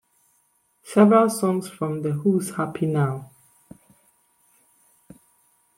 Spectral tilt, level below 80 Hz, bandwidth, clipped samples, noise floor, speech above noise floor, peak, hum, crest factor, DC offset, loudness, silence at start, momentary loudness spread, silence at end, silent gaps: -7 dB/octave; -68 dBFS; 15.5 kHz; under 0.1%; -66 dBFS; 46 dB; -4 dBFS; none; 20 dB; under 0.1%; -21 LUFS; 0.85 s; 12 LU; 2.55 s; none